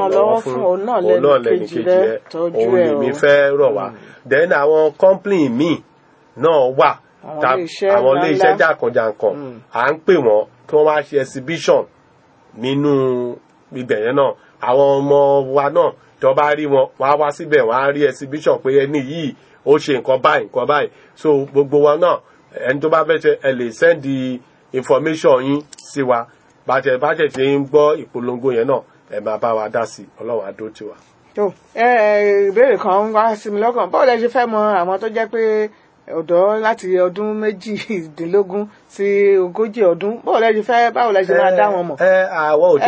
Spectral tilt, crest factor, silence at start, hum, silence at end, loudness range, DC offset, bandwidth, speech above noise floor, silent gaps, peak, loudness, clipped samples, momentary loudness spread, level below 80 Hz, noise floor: -6 dB/octave; 16 dB; 0 s; none; 0 s; 4 LU; under 0.1%; 8 kHz; 36 dB; none; 0 dBFS; -16 LUFS; under 0.1%; 11 LU; -64 dBFS; -51 dBFS